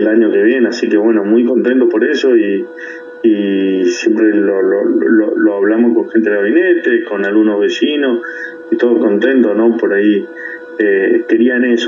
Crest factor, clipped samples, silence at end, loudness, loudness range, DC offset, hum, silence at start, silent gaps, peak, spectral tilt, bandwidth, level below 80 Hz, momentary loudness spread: 12 dB; under 0.1%; 0 s; -12 LUFS; 1 LU; under 0.1%; none; 0 s; none; 0 dBFS; -5.5 dB/octave; 7.4 kHz; -72 dBFS; 6 LU